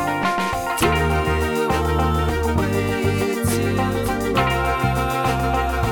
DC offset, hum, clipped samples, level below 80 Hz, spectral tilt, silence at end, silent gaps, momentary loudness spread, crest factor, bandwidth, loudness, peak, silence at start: under 0.1%; none; under 0.1%; -28 dBFS; -5.5 dB/octave; 0 s; none; 2 LU; 16 dB; over 20 kHz; -20 LUFS; -4 dBFS; 0 s